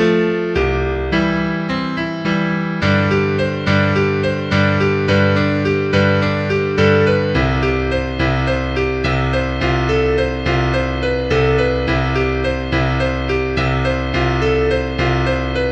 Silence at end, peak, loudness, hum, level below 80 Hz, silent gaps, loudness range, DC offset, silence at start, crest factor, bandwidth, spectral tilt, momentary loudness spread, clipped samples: 0 s; 0 dBFS; -17 LUFS; none; -28 dBFS; none; 2 LU; under 0.1%; 0 s; 16 dB; 8.4 kHz; -7 dB/octave; 4 LU; under 0.1%